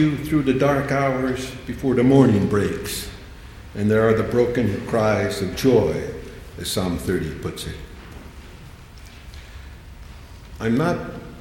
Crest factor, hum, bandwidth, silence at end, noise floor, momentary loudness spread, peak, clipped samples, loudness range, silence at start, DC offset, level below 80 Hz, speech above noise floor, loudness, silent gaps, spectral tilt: 20 dB; none; 17 kHz; 0 s; -41 dBFS; 24 LU; -2 dBFS; under 0.1%; 12 LU; 0 s; under 0.1%; -40 dBFS; 21 dB; -21 LUFS; none; -6.5 dB/octave